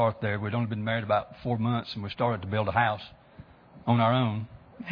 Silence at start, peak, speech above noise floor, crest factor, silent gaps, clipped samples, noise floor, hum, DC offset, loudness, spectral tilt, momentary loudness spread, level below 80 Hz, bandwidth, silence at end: 0 s; -8 dBFS; 24 dB; 20 dB; none; under 0.1%; -51 dBFS; none; under 0.1%; -28 LUFS; -9 dB/octave; 12 LU; -58 dBFS; 5.4 kHz; 0 s